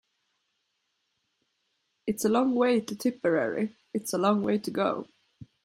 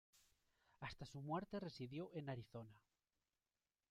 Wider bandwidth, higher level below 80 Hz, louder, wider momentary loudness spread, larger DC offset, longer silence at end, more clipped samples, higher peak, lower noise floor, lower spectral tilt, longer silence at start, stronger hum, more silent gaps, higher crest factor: about the same, 15.5 kHz vs 15 kHz; first, -70 dBFS vs -76 dBFS; first, -28 LUFS vs -51 LUFS; about the same, 9 LU vs 10 LU; neither; second, 0.2 s vs 1.1 s; neither; first, -10 dBFS vs -32 dBFS; second, -78 dBFS vs under -90 dBFS; about the same, -5.5 dB/octave vs -6.5 dB/octave; first, 2.05 s vs 0.15 s; neither; neither; about the same, 20 dB vs 20 dB